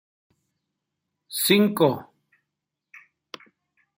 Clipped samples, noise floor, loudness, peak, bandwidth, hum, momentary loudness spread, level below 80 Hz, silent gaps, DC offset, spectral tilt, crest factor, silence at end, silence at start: under 0.1%; -84 dBFS; -22 LUFS; -4 dBFS; 16 kHz; none; 25 LU; -72 dBFS; none; under 0.1%; -4.5 dB/octave; 22 dB; 1.95 s; 1.3 s